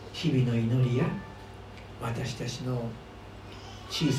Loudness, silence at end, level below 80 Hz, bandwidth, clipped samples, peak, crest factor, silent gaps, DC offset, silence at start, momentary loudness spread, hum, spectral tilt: -30 LUFS; 0 s; -52 dBFS; 13.5 kHz; under 0.1%; -14 dBFS; 16 dB; none; under 0.1%; 0 s; 19 LU; none; -6.5 dB/octave